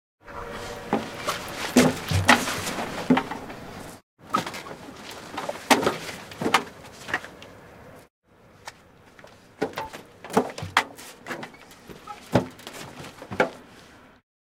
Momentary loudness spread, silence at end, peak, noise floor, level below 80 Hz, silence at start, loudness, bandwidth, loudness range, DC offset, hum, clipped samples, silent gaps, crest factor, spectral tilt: 23 LU; 0.35 s; 0 dBFS; -52 dBFS; -56 dBFS; 0.25 s; -26 LUFS; 17.5 kHz; 9 LU; under 0.1%; none; under 0.1%; 4.03-4.17 s, 8.10-8.22 s; 28 dB; -4 dB/octave